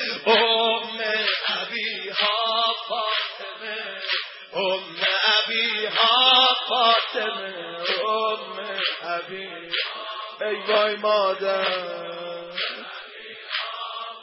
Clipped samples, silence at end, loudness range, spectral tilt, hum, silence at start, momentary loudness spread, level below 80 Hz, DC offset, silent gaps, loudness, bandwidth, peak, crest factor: under 0.1%; 0 s; 7 LU; -5 dB/octave; none; 0 s; 14 LU; -82 dBFS; under 0.1%; none; -22 LUFS; 6 kHz; -6 dBFS; 18 dB